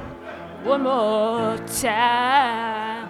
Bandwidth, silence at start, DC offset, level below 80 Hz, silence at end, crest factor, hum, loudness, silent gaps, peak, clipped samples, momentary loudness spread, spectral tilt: 16 kHz; 0 s; under 0.1%; -54 dBFS; 0 s; 18 dB; none; -21 LUFS; none; -4 dBFS; under 0.1%; 14 LU; -3.5 dB/octave